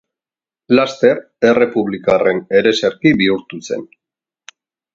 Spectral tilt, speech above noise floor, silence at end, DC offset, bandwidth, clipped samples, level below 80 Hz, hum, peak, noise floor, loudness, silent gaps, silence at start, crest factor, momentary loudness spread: -5.5 dB/octave; over 76 dB; 1.1 s; under 0.1%; 7.8 kHz; under 0.1%; -54 dBFS; none; 0 dBFS; under -90 dBFS; -15 LUFS; none; 0.7 s; 16 dB; 11 LU